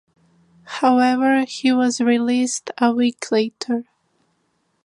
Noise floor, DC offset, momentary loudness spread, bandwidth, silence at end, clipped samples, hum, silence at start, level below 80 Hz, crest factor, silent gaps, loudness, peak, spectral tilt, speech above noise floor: -68 dBFS; under 0.1%; 9 LU; 11.5 kHz; 1.05 s; under 0.1%; none; 0.65 s; -74 dBFS; 16 dB; none; -19 LUFS; -4 dBFS; -3.5 dB/octave; 49 dB